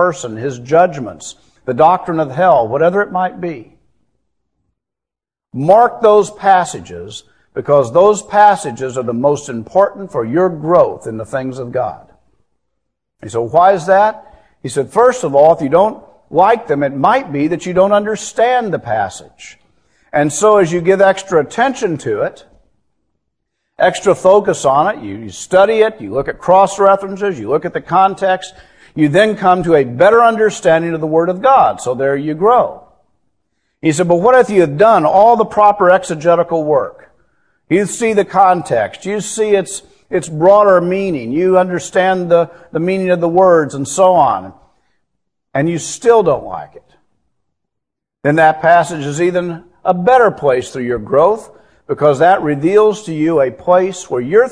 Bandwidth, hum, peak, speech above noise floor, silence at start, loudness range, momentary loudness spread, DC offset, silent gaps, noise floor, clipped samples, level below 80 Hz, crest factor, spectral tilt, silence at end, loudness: 11 kHz; none; 0 dBFS; 74 dB; 0 s; 5 LU; 12 LU; 0.1%; none; -87 dBFS; 0.1%; -50 dBFS; 14 dB; -5.5 dB/octave; 0 s; -13 LUFS